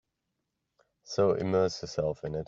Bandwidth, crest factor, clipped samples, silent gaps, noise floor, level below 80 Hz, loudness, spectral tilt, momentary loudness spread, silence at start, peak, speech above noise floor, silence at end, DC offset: 7.6 kHz; 18 dB; under 0.1%; none; -83 dBFS; -60 dBFS; -29 LUFS; -6 dB/octave; 6 LU; 1.1 s; -14 dBFS; 54 dB; 0 s; under 0.1%